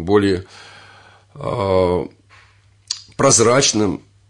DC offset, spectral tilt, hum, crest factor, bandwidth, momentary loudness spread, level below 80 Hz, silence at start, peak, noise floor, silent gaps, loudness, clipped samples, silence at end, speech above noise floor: under 0.1%; -3.5 dB/octave; none; 16 dB; 11 kHz; 16 LU; -50 dBFS; 0 s; -2 dBFS; -52 dBFS; none; -17 LUFS; under 0.1%; 0.3 s; 35 dB